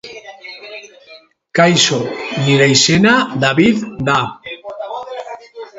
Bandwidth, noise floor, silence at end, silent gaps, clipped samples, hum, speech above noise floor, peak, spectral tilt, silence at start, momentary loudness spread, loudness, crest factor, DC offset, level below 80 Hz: 8 kHz; -43 dBFS; 0 s; none; under 0.1%; none; 30 dB; 0 dBFS; -4 dB/octave; 0.05 s; 22 LU; -13 LUFS; 16 dB; under 0.1%; -52 dBFS